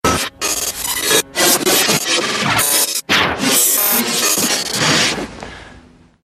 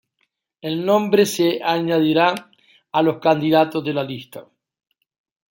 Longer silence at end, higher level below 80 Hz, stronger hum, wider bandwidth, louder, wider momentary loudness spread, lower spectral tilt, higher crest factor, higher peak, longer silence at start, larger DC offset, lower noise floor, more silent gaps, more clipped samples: second, 0.45 s vs 1.1 s; first, -44 dBFS vs -66 dBFS; neither; about the same, 15.5 kHz vs 17 kHz; first, -13 LUFS vs -19 LUFS; second, 7 LU vs 15 LU; second, -1.5 dB/octave vs -5.5 dB/octave; about the same, 16 dB vs 18 dB; about the same, 0 dBFS vs -2 dBFS; second, 0.05 s vs 0.65 s; neither; second, -44 dBFS vs -71 dBFS; neither; neither